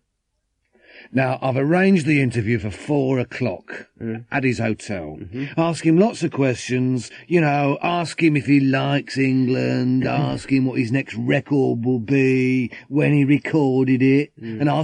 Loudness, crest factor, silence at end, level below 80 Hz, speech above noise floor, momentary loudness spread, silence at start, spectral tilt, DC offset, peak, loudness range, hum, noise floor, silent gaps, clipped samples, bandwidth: -20 LUFS; 16 dB; 0 s; -56 dBFS; 54 dB; 9 LU; 0.95 s; -7 dB/octave; under 0.1%; -4 dBFS; 4 LU; none; -73 dBFS; none; under 0.1%; 10 kHz